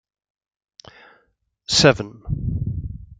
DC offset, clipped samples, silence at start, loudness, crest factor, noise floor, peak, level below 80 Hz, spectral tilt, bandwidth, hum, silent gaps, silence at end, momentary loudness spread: under 0.1%; under 0.1%; 1.7 s; -20 LUFS; 22 dB; -66 dBFS; -2 dBFS; -38 dBFS; -4 dB/octave; 9.6 kHz; none; none; 0.05 s; 16 LU